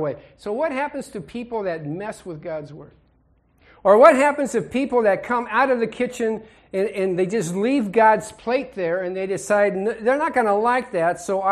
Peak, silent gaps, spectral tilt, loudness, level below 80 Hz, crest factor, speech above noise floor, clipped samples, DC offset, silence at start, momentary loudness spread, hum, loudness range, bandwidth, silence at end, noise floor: 0 dBFS; none; -5.5 dB/octave; -21 LUFS; -58 dBFS; 20 dB; 40 dB; under 0.1%; under 0.1%; 0 s; 15 LU; none; 10 LU; 13 kHz; 0 s; -60 dBFS